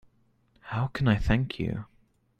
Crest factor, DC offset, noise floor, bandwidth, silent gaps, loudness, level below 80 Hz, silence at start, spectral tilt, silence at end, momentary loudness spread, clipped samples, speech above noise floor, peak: 22 dB; under 0.1%; -66 dBFS; 8.8 kHz; none; -29 LUFS; -40 dBFS; 0.65 s; -8 dB/octave; 0.55 s; 12 LU; under 0.1%; 40 dB; -8 dBFS